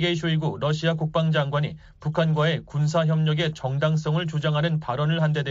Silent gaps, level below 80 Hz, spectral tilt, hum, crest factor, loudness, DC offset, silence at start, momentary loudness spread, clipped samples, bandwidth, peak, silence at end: none; -54 dBFS; -5.5 dB/octave; none; 14 dB; -24 LUFS; under 0.1%; 0 s; 4 LU; under 0.1%; 7.6 kHz; -10 dBFS; 0 s